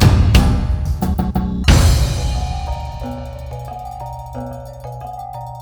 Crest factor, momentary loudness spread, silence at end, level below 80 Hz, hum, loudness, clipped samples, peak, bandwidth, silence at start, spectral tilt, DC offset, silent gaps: 16 dB; 17 LU; 0 s; -20 dBFS; none; -18 LUFS; under 0.1%; 0 dBFS; over 20 kHz; 0 s; -5.5 dB/octave; under 0.1%; none